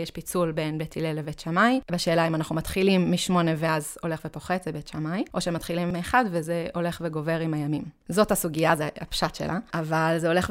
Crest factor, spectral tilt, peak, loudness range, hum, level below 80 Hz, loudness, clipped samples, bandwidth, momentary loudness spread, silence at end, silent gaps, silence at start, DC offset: 20 dB; -5.5 dB/octave; -6 dBFS; 3 LU; none; -50 dBFS; -26 LUFS; under 0.1%; 16 kHz; 8 LU; 0 s; none; 0 s; under 0.1%